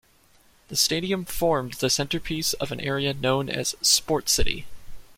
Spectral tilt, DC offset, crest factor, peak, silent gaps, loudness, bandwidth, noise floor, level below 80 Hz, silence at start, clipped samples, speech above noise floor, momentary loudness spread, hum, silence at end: -2.5 dB/octave; under 0.1%; 20 dB; -6 dBFS; none; -24 LUFS; 16.5 kHz; -58 dBFS; -40 dBFS; 0.7 s; under 0.1%; 34 dB; 8 LU; none; 0.05 s